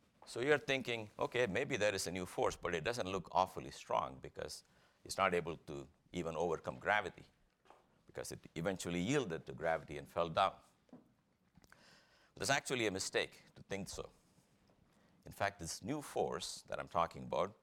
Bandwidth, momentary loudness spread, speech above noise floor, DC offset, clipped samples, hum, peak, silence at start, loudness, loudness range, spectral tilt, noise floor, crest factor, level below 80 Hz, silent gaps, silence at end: 17.5 kHz; 13 LU; 36 dB; under 0.1%; under 0.1%; none; -16 dBFS; 0.2 s; -39 LUFS; 5 LU; -4 dB/octave; -75 dBFS; 24 dB; -68 dBFS; none; 0.1 s